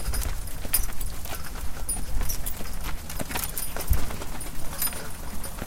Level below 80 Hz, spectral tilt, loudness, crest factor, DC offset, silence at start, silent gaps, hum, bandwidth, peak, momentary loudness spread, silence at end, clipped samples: -32 dBFS; -3 dB/octave; -31 LUFS; 18 dB; under 0.1%; 0 s; none; none; 17 kHz; -8 dBFS; 10 LU; 0 s; under 0.1%